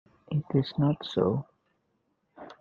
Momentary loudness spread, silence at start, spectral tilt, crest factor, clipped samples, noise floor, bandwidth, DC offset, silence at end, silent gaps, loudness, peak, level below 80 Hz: 7 LU; 0.3 s; -9 dB/octave; 20 dB; under 0.1%; -75 dBFS; 7 kHz; under 0.1%; 0.1 s; none; -29 LUFS; -10 dBFS; -64 dBFS